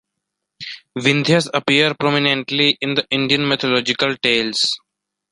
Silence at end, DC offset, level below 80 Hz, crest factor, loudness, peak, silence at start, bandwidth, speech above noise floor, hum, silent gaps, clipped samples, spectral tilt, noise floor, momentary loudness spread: 0.55 s; under 0.1%; -60 dBFS; 18 dB; -16 LUFS; -2 dBFS; 0.6 s; 11.5 kHz; 61 dB; none; none; under 0.1%; -4 dB/octave; -79 dBFS; 10 LU